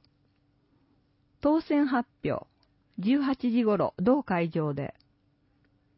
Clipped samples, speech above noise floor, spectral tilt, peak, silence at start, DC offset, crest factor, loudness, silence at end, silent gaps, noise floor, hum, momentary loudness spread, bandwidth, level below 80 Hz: under 0.1%; 42 dB; -11 dB/octave; -12 dBFS; 1.45 s; under 0.1%; 16 dB; -28 LUFS; 1.1 s; none; -69 dBFS; none; 9 LU; 5.8 kHz; -62 dBFS